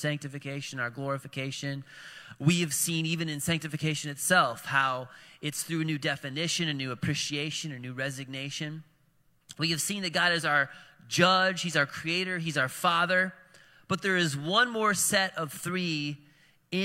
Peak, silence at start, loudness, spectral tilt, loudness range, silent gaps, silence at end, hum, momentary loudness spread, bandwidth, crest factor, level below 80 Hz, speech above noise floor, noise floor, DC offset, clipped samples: -6 dBFS; 0 s; -28 LUFS; -3.5 dB/octave; 5 LU; none; 0 s; none; 12 LU; 16.5 kHz; 24 dB; -70 dBFS; 38 dB; -67 dBFS; under 0.1%; under 0.1%